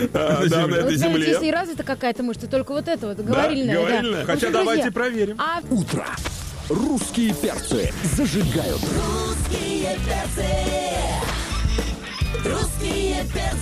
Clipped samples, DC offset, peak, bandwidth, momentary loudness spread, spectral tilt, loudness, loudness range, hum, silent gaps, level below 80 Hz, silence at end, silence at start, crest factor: under 0.1%; under 0.1%; -8 dBFS; 15.5 kHz; 7 LU; -5 dB/octave; -22 LUFS; 3 LU; none; none; -32 dBFS; 0 s; 0 s; 14 dB